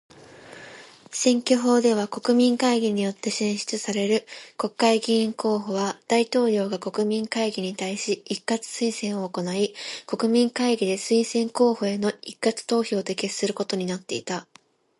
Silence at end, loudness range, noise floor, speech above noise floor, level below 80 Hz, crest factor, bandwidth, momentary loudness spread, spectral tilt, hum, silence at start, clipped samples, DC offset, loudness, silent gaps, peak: 0.6 s; 4 LU; -46 dBFS; 22 dB; -72 dBFS; 18 dB; 11.5 kHz; 10 LU; -4 dB/octave; none; 0.15 s; under 0.1%; under 0.1%; -24 LUFS; none; -6 dBFS